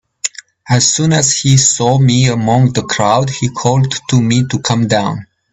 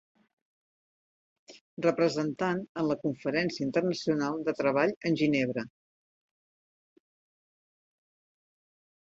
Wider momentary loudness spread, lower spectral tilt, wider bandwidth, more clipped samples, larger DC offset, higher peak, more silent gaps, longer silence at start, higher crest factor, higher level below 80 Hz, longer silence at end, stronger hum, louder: first, 8 LU vs 5 LU; second, -4.5 dB/octave vs -6 dB/octave; about the same, 8.4 kHz vs 7.8 kHz; neither; neither; first, 0 dBFS vs -12 dBFS; second, none vs 1.61-1.77 s, 2.69-2.75 s, 4.96-5.01 s; second, 0.25 s vs 1.5 s; second, 12 dB vs 20 dB; first, -44 dBFS vs -72 dBFS; second, 0.3 s vs 3.5 s; neither; first, -12 LUFS vs -29 LUFS